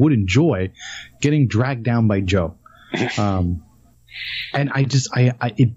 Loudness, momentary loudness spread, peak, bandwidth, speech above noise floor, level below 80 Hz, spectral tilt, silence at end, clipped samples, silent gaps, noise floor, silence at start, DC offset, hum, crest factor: -20 LUFS; 12 LU; -4 dBFS; 8 kHz; 30 dB; -44 dBFS; -6.5 dB/octave; 0 s; under 0.1%; none; -49 dBFS; 0 s; under 0.1%; none; 14 dB